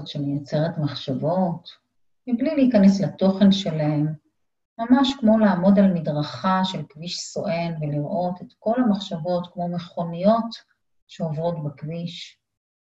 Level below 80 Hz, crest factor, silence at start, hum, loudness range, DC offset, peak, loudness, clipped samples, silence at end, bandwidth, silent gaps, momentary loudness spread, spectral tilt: -60 dBFS; 18 dB; 0 s; none; 6 LU; under 0.1%; -4 dBFS; -22 LUFS; under 0.1%; 0.5 s; 8 kHz; 4.65-4.76 s, 11.02-11.07 s; 14 LU; -7 dB/octave